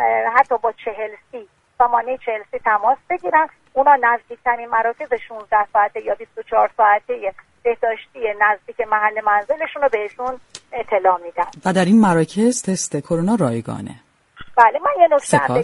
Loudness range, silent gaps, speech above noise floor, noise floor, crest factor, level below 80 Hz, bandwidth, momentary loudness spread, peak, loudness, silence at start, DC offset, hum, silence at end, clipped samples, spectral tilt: 2 LU; none; 22 dB; -40 dBFS; 18 dB; -56 dBFS; 11.5 kHz; 13 LU; 0 dBFS; -18 LUFS; 0 s; under 0.1%; none; 0 s; under 0.1%; -5.5 dB/octave